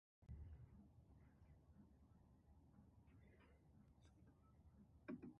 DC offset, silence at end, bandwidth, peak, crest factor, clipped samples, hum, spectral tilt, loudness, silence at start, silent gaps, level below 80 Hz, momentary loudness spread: under 0.1%; 0 s; 3 kHz; -42 dBFS; 22 dB; under 0.1%; none; -7.5 dB/octave; -62 LUFS; 0.2 s; none; -70 dBFS; 9 LU